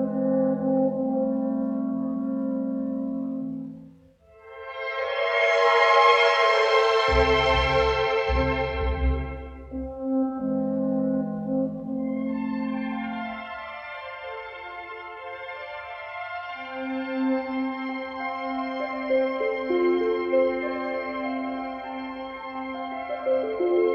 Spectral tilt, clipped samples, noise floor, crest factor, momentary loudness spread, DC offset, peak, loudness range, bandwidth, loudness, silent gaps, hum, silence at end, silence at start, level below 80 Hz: -6 dB/octave; under 0.1%; -54 dBFS; 18 dB; 16 LU; under 0.1%; -6 dBFS; 12 LU; 8 kHz; -25 LUFS; none; none; 0 s; 0 s; -40 dBFS